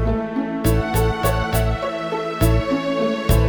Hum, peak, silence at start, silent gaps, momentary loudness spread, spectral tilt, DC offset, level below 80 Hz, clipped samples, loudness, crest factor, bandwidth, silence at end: none; -4 dBFS; 0 s; none; 5 LU; -6 dB/octave; under 0.1%; -26 dBFS; under 0.1%; -21 LUFS; 16 dB; over 20 kHz; 0 s